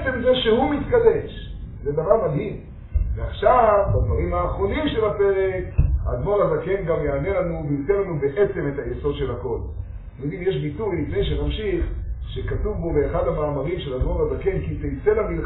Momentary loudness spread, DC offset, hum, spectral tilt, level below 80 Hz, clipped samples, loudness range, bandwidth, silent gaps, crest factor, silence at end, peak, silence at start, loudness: 11 LU; under 0.1%; none; -6 dB/octave; -30 dBFS; under 0.1%; 5 LU; 4.1 kHz; none; 20 dB; 0 s; -2 dBFS; 0 s; -22 LUFS